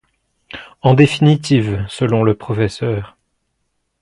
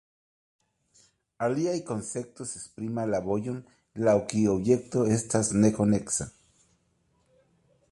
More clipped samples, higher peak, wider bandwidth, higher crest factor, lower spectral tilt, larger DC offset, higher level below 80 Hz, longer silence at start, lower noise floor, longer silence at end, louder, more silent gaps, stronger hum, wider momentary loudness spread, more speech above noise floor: neither; first, 0 dBFS vs -10 dBFS; about the same, 11.5 kHz vs 11.5 kHz; about the same, 16 dB vs 20 dB; about the same, -7 dB/octave vs -6 dB/octave; neither; first, -44 dBFS vs -58 dBFS; second, 0.55 s vs 1.4 s; about the same, -69 dBFS vs -70 dBFS; second, 0.95 s vs 1.6 s; first, -15 LUFS vs -27 LUFS; neither; neither; first, 22 LU vs 14 LU; first, 55 dB vs 43 dB